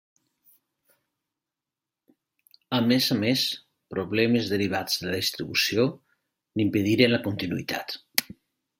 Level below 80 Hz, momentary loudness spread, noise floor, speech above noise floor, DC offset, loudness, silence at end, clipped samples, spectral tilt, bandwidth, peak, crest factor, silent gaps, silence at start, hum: -66 dBFS; 9 LU; -89 dBFS; 64 dB; under 0.1%; -25 LUFS; 0.55 s; under 0.1%; -4.5 dB/octave; 16.5 kHz; 0 dBFS; 28 dB; none; 2.7 s; none